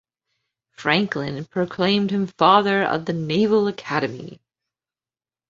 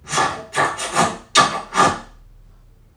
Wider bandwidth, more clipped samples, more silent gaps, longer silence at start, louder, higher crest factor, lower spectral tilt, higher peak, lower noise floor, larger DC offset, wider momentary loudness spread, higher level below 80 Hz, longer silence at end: second, 7.6 kHz vs 16 kHz; neither; neither; first, 0.8 s vs 0.05 s; second, -21 LUFS vs -18 LUFS; about the same, 20 dB vs 20 dB; first, -6.5 dB/octave vs -2 dB/octave; about the same, -2 dBFS vs 0 dBFS; first, under -90 dBFS vs -48 dBFS; neither; first, 11 LU vs 5 LU; second, -62 dBFS vs -48 dBFS; first, 1.15 s vs 0.9 s